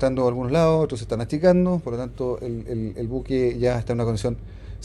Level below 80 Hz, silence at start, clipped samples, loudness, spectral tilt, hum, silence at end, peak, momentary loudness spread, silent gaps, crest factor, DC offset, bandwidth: -40 dBFS; 0 s; under 0.1%; -23 LUFS; -7.5 dB/octave; none; 0 s; -6 dBFS; 11 LU; none; 18 dB; under 0.1%; 12 kHz